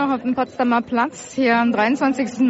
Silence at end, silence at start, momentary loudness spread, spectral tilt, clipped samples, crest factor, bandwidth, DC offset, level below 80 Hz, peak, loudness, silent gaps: 0 s; 0 s; 5 LU; -3.5 dB/octave; under 0.1%; 14 dB; 8 kHz; under 0.1%; -60 dBFS; -6 dBFS; -19 LUFS; none